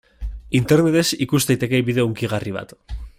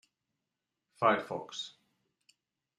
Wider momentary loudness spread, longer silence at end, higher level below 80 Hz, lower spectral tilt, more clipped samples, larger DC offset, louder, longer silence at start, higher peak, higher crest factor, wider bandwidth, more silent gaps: first, 19 LU vs 13 LU; second, 0.1 s vs 1.1 s; first, -38 dBFS vs -82 dBFS; first, -5.5 dB/octave vs -4 dB/octave; neither; neither; first, -19 LUFS vs -33 LUFS; second, 0.2 s vs 1 s; first, -4 dBFS vs -12 dBFS; second, 16 dB vs 24 dB; first, 16 kHz vs 12 kHz; neither